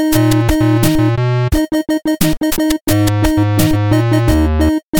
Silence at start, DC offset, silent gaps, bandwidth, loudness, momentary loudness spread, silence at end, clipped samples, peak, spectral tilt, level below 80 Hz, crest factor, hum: 0 s; under 0.1%; 2.81-2.87 s, 4.83-4.93 s; 17.5 kHz; -14 LUFS; 3 LU; 0 s; under 0.1%; 0 dBFS; -6 dB/octave; -24 dBFS; 12 dB; none